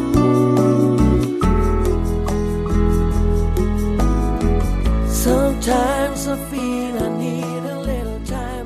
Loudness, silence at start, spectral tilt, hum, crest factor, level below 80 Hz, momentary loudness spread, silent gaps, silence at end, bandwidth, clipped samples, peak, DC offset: -19 LUFS; 0 s; -6.5 dB/octave; none; 16 dB; -22 dBFS; 9 LU; none; 0 s; 14 kHz; under 0.1%; -2 dBFS; under 0.1%